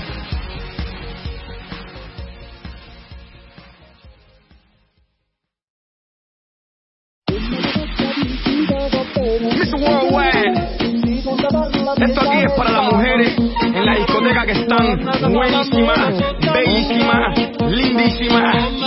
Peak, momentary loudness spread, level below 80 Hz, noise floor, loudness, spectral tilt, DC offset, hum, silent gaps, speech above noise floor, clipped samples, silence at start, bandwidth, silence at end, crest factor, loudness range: -2 dBFS; 17 LU; -32 dBFS; -75 dBFS; -16 LUFS; -9.5 dB/octave; under 0.1%; none; 5.64-7.22 s; 60 dB; under 0.1%; 0 s; 5.8 kHz; 0 s; 16 dB; 18 LU